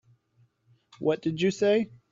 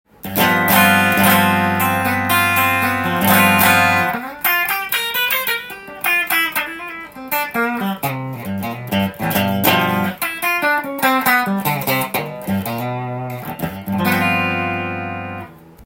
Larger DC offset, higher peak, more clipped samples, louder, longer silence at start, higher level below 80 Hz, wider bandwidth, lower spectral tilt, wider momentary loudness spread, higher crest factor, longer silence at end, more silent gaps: neither; second, -12 dBFS vs 0 dBFS; neither; second, -27 LUFS vs -16 LUFS; first, 1 s vs 0.25 s; second, -66 dBFS vs -54 dBFS; second, 7.8 kHz vs 17 kHz; first, -6 dB/octave vs -4 dB/octave; second, 5 LU vs 14 LU; about the same, 16 dB vs 18 dB; first, 0.25 s vs 0 s; neither